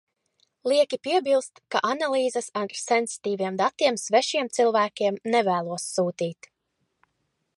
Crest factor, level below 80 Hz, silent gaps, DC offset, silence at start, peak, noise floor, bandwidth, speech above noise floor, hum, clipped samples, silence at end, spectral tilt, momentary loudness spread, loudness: 18 dB; -80 dBFS; none; under 0.1%; 0.65 s; -8 dBFS; -76 dBFS; 11.5 kHz; 52 dB; none; under 0.1%; 1.25 s; -3.5 dB/octave; 7 LU; -25 LUFS